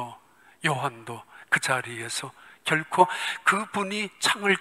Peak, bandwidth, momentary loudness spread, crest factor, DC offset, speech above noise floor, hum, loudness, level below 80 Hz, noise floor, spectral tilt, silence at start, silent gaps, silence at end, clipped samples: -4 dBFS; 16 kHz; 17 LU; 24 dB; under 0.1%; 28 dB; none; -26 LUFS; -76 dBFS; -54 dBFS; -3 dB/octave; 0 s; none; 0 s; under 0.1%